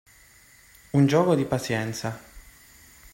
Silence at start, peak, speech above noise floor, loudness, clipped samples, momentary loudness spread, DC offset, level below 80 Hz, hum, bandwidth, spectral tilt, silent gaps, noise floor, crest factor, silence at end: 0.95 s; -8 dBFS; 31 dB; -24 LUFS; under 0.1%; 14 LU; under 0.1%; -56 dBFS; none; 16.5 kHz; -6.5 dB/octave; none; -54 dBFS; 18 dB; 0.75 s